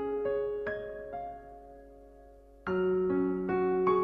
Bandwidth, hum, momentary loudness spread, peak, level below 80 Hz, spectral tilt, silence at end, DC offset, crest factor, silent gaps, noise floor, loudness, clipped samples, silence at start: 4.8 kHz; none; 21 LU; -16 dBFS; -58 dBFS; -9.5 dB/octave; 0 s; under 0.1%; 16 dB; none; -54 dBFS; -32 LUFS; under 0.1%; 0 s